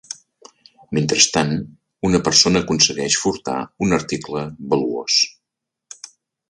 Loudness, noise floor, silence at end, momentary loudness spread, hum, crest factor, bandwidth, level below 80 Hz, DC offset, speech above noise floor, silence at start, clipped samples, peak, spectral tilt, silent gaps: -18 LUFS; -82 dBFS; 0.45 s; 20 LU; none; 20 dB; 11.5 kHz; -48 dBFS; under 0.1%; 64 dB; 0.1 s; under 0.1%; 0 dBFS; -3 dB/octave; none